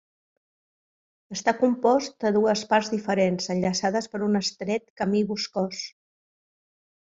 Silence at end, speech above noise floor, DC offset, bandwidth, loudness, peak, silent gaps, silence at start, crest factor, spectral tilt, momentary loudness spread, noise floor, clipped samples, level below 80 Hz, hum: 1.15 s; over 66 dB; under 0.1%; 7.8 kHz; -25 LUFS; -6 dBFS; 4.90-4.96 s; 1.3 s; 20 dB; -4.5 dB/octave; 8 LU; under -90 dBFS; under 0.1%; -66 dBFS; none